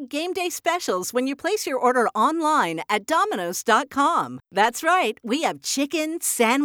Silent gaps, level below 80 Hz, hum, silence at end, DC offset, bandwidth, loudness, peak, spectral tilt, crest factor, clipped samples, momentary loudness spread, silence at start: none; -70 dBFS; none; 0 s; under 0.1%; over 20 kHz; -22 LUFS; -6 dBFS; -2.5 dB/octave; 18 dB; under 0.1%; 6 LU; 0 s